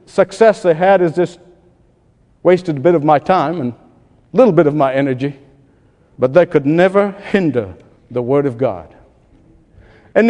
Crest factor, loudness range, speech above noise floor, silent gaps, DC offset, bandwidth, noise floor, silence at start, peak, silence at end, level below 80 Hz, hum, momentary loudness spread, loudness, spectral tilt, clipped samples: 16 dB; 3 LU; 40 dB; none; under 0.1%; 10.5 kHz; -53 dBFS; 0.15 s; 0 dBFS; 0 s; -52 dBFS; none; 10 LU; -14 LUFS; -7.5 dB/octave; under 0.1%